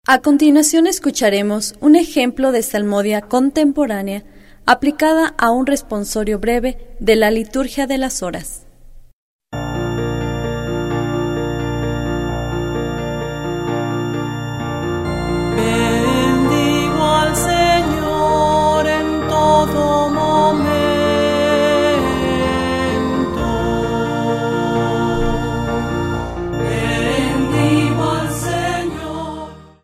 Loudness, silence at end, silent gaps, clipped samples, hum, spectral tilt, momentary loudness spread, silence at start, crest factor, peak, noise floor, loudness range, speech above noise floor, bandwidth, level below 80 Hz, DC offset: -17 LUFS; 0.15 s; 9.13-9.39 s; under 0.1%; none; -5 dB/octave; 9 LU; 0.1 s; 16 dB; 0 dBFS; -40 dBFS; 7 LU; 25 dB; 16 kHz; -32 dBFS; under 0.1%